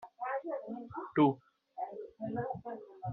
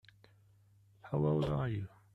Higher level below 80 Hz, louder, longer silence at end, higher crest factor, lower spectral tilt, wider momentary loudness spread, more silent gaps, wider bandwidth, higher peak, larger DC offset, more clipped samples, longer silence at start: second, -74 dBFS vs -58 dBFS; about the same, -36 LUFS vs -35 LUFS; second, 0 s vs 0.3 s; first, 22 dB vs 16 dB; second, -6.5 dB/octave vs -9.5 dB/octave; first, 15 LU vs 8 LU; neither; second, 4.1 kHz vs 5.8 kHz; first, -16 dBFS vs -22 dBFS; neither; neither; second, 0 s vs 1.05 s